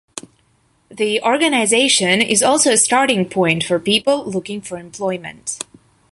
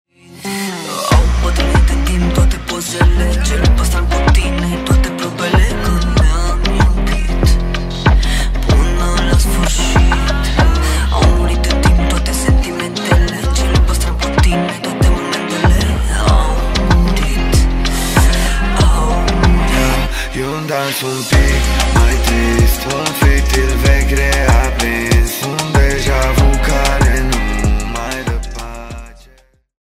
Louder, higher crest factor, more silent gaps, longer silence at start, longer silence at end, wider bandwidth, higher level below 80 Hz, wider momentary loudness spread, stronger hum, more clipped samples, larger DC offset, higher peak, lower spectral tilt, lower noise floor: about the same, -15 LUFS vs -14 LUFS; about the same, 16 dB vs 12 dB; neither; second, 0.15 s vs 0.3 s; second, 0.55 s vs 0.7 s; second, 12 kHz vs 15.5 kHz; second, -58 dBFS vs -14 dBFS; first, 15 LU vs 6 LU; neither; neither; neither; about the same, -2 dBFS vs 0 dBFS; second, -2.5 dB/octave vs -5 dB/octave; first, -59 dBFS vs -48 dBFS